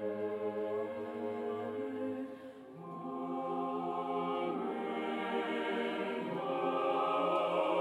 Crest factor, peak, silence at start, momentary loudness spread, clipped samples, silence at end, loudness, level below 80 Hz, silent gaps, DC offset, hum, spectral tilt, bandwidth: 16 dB; -20 dBFS; 0 s; 10 LU; under 0.1%; 0 s; -36 LUFS; -84 dBFS; none; under 0.1%; none; -6.5 dB/octave; 12 kHz